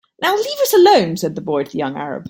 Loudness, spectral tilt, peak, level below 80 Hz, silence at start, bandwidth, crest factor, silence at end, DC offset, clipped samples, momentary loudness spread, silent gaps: -16 LUFS; -4.5 dB/octave; 0 dBFS; -60 dBFS; 0.2 s; 17 kHz; 16 dB; 0 s; under 0.1%; under 0.1%; 12 LU; none